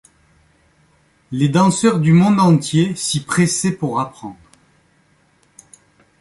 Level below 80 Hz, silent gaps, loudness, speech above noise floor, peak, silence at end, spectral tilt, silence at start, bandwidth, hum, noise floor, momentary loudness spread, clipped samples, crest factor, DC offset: -54 dBFS; none; -16 LUFS; 42 dB; -2 dBFS; 1.9 s; -5.5 dB/octave; 1.3 s; 11.5 kHz; none; -57 dBFS; 14 LU; under 0.1%; 16 dB; under 0.1%